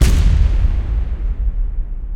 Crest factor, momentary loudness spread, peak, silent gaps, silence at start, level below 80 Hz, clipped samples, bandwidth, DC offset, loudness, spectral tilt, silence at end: 14 dB; 11 LU; 0 dBFS; none; 0 s; -14 dBFS; under 0.1%; 13.5 kHz; under 0.1%; -19 LUFS; -6 dB/octave; 0 s